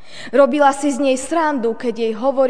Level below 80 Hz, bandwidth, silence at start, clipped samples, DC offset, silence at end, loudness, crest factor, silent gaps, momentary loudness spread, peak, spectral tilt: -58 dBFS; 10 kHz; 0.1 s; under 0.1%; 2%; 0 s; -17 LUFS; 16 dB; none; 8 LU; 0 dBFS; -4 dB/octave